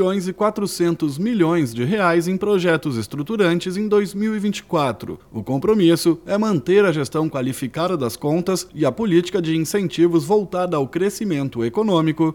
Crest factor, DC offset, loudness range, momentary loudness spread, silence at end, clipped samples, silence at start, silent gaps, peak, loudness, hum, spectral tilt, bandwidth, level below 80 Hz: 14 dB; under 0.1%; 1 LU; 7 LU; 0 s; under 0.1%; 0 s; none; -4 dBFS; -20 LUFS; none; -6 dB/octave; 18 kHz; -54 dBFS